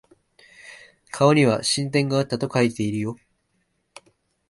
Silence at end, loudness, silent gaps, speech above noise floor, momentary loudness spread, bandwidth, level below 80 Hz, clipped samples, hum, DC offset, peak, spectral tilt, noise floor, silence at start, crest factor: 1.35 s; -21 LUFS; none; 50 dB; 25 LU; 11.5 kHz; -62 dBFS; under 0.1%; none; under 0.1%; -4 dBFS; -5 dB/octave; -71 dBFS; 0.65 s; 20 dB